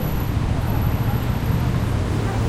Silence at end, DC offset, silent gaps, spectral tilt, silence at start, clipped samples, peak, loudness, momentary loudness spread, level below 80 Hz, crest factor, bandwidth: 0 s; under 0.1%; none; -7 dB/octave; 0 s; under 0.1%; -8 dBFS; -22 LUFS; 1 LU; -28 dBFS; 12 dB; 15 kHz